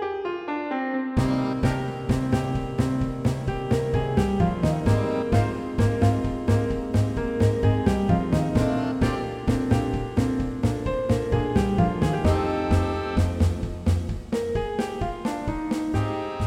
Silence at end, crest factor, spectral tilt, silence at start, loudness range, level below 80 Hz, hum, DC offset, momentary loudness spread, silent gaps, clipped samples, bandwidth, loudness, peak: 0 s; 16 dB; -7.5 dB/octave; 0 s; 2 LU; -34 dBFS; none; under 0.1%; 6 LU; none; under 0.1%; 15 kHz; -25 LUFS; -6 dBFS